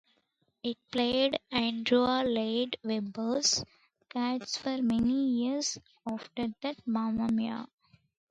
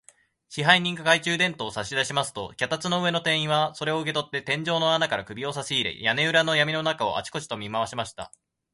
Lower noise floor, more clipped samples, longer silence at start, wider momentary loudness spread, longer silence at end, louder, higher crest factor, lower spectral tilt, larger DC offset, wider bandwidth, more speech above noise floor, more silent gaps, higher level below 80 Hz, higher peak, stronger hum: first, -75 dBFS vs -58 dBFS; neither; first, 0.65 s vs 0.5 s; about the same, 12 LU vs 12 LU; first, 0.65 s vs 0.45 s; second, -31 LUFS vs -24 LUFS; second, 18 dB vs 24 dB; about the same, -3.5 dB/octave vs -3.5 dB/octave; neither; second, 9.2 kHz vs 11.5 kHz; first, 45 dB vs 32 dB; neither; about the same, -64 dBFS vs -62 dBFS; second, -12 dBFS vs -2 dBFS; neither